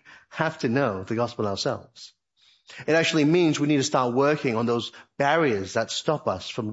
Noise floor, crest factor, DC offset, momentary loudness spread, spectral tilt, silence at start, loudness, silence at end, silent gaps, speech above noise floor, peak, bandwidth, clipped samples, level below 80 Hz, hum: -62 dBFS; 18 dB; under 0.1%; 9 LU; -5 dB/octave; 0.1 s; -24 LUFS; 0 s; none; 38 dB; -6 dBFS; 8 kHz; under 0.1%; -68 dBFS; none